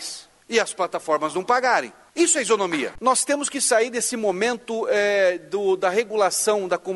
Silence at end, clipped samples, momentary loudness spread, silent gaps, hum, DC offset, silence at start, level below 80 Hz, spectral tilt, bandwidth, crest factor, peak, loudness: 0 s; under 0.1%; 6 LU; none; none; under 0.1%; 0 s; -64 dBFS; -2 dB/octave; 12 kHz; 18 dB; -4 dBFS; -21 LUFS